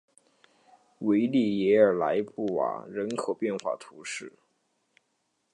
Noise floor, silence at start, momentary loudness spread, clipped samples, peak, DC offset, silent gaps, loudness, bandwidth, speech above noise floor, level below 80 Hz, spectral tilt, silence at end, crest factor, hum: -76 dBFS; 1 s; 15 LU; under 0.1%; -8 dBFS; under 0.1%; none; -27 LUFS; 11 kHz; 49 dB; -74 dBFS; -6 dB/octave; 1.25 s; 20 dB; none